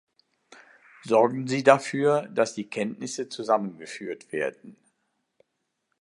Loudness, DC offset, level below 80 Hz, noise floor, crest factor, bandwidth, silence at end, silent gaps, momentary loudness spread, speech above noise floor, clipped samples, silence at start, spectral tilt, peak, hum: -25 LUFS; under 0.1%; -78 dBFS; -79 dBFS; 26 dB; 11.5 kHz; 1.3 s; none; 16 LU; 54 dB; under 0.1%; 1.05 s; -5 dB/octave; 0 dBFS; none